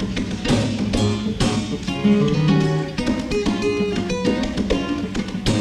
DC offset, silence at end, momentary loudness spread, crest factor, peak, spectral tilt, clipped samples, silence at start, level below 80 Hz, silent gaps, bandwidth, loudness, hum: under 0.1%; 0 s; 7 LU; 16 dB; -4 dBFS; -6 dB/octave; under 0.1%; 0 s; -34 dBFS; none; 12 kHz; -21 LUFS; none